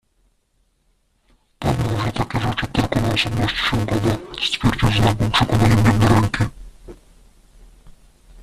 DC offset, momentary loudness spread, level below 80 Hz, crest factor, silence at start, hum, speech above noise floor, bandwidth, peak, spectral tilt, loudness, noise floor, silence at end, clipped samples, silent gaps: under 0.1%; 8 LU; -34 dBFS; 16 dB; 1.6 s; none; 47 dB; 14 kHz; -4 dBFS; -5.5 dB/octave; -19 LUFS; -64 dBFS; 0 s; under 0.1%; none